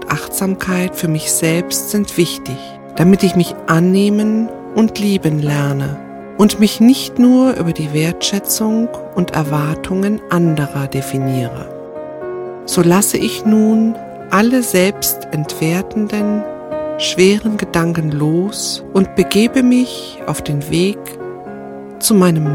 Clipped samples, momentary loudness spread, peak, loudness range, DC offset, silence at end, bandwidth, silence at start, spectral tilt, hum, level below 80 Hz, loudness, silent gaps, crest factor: under 0.1%; 14 LU; 0 dBFS; 3 LU; under 0.1%; 0 s; 17.5 kHz; 0 s; -5 dB/octave; none; -46 dBFS; -15 LUFS; none; 14 dB